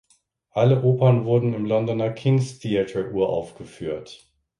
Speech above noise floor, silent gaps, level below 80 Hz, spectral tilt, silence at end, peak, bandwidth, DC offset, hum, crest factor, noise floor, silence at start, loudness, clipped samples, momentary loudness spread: 43 dB; none; -56 dBFS; -8 dB/octave; 0.45 s; -4 dBFS; 10.5 kHz; under 0.1%; none; 18 dB; -64 dBFS; 0.55 s; -22 LUFS; under 0.1%; 13 LU